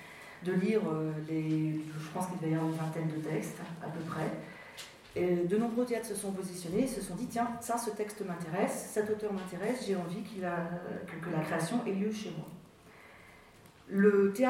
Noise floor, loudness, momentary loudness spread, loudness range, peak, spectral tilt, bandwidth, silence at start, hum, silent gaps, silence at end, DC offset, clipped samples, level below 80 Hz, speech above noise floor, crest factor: -57 dBFS; -34 LUFS; 12 LU; 3 LU; -14 dBFS; -6 dB/octave; 16.5 kHz; 0 s; none; none; 0 s; under 0.1%; under 0.1%; -68 dBFS; 24 dB; 20 dB